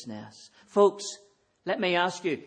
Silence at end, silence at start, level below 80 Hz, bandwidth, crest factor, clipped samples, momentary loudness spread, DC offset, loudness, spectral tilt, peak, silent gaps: 0 s; 0 s; -74 dBFS; 9.8 kHz; 20 dB; under 0.1%; 20 LU; under 0.1%; -27 LUFS; -4 dB/octave; -8 dBFS; none